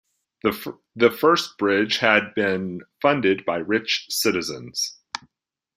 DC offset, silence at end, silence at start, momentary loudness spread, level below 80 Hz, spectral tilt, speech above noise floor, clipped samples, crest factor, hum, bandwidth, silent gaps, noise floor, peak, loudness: under 0.1%; 0.6 s; 0.45 s; 15 LU; -64 dBFS; -3.5 dB/octave; 60 dB; under 0.1%; 22 dB; none; 16 kHz; none; -82 dBFS; -2 dBFS; -22 LUFS